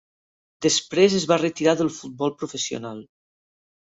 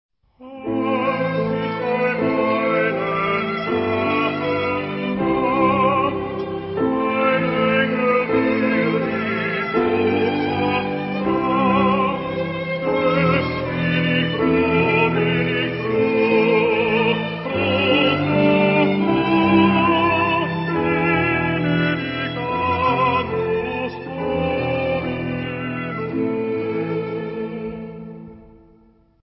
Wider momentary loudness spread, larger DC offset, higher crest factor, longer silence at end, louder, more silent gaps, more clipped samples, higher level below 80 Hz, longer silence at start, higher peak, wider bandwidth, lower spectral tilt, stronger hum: first, 12 LU vs 9 LU; neither; about the same, 20 dB vs 16 dB; first, 0.95 s vs 0.8 s; second, -22 LUFS vs -19 LUFS; neither; neither; second, -64 dBFS vs -44 dBFS; first, 0.6 s vs 0.4 s; about the same, -6 dBFS vs -4 dBFS; first, 8.2 kHz vs 5.8 kHz; second, -4 dB/octave vs -11.5 dB/octave; neither